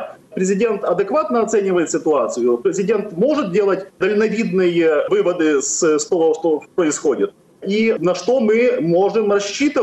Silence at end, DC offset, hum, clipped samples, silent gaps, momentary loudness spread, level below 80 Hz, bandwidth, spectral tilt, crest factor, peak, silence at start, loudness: 0 s; under 0.1%; none; under 0.1%; none; 4 LU; -62 dBFS; 11.5 kHz; -4.5 dB/octave; 10 dB; -8 dBFS; 0 s; -17 LUFS